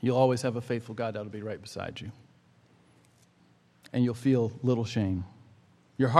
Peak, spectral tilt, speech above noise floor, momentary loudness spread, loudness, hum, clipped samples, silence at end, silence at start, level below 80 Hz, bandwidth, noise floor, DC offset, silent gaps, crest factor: -4 dBFS; -7 dB/octave; 34 dB; 14 LU; -30 LUFS; none; under 0.1%; 0 s; 0 s; -66 dBFS; 12.5 kHz; -63 dBFS; under 0.1%; none; 26 dB